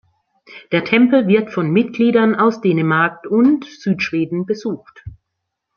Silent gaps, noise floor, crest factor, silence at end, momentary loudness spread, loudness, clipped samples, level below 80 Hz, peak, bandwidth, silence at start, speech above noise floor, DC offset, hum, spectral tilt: none; -77 dBFS; 16 dB; 0.65 s; 9 LU; -16 LUFS; under 0.1%; -54 dBFS; 0 dBFS; 6.8 kHz; 0.5 s; 61 dB; under 0.1%; none; -7.5 dB/octave